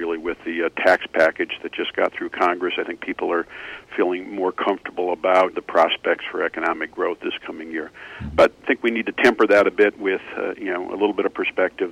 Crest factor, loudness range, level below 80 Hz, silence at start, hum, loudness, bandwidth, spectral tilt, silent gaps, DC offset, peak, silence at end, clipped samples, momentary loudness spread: 16 dB; 4 LU; -52 dBFS; 0 s; none; -21 LUFS; 12.5 kHz; -5 dB/octave; none; under 0.1%; -4 dBFS; 0 s; under 0.1%; 11 LU